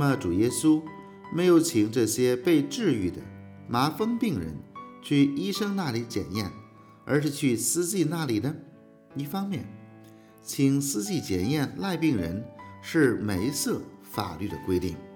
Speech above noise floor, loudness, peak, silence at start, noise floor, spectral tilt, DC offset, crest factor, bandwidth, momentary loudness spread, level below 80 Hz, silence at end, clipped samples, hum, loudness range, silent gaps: 25 dB; -27 LUFS; -10 dBFS; 0 s; -51 dBFS; -5 dB/octave; under 0.1%; 18 dB; over 20 kHz; 18 LU; -60 dBFS; 0 s; under 0.1%; none; 5 LU; none